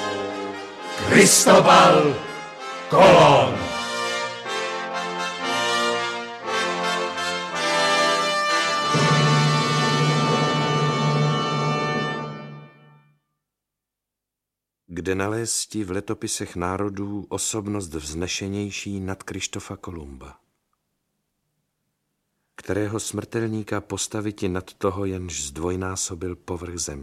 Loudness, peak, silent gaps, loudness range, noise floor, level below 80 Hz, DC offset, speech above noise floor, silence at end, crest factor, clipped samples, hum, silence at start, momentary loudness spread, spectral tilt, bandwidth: -21 LUFS; -2 dBFS; none; 16 LU; -85 dBFS; -52 dBFS; under 0.1%; 64 dB; 0 s; 20 dB; under 0.1%; none; 0 s; 18 LU; -4 dB/octave; 15 kHz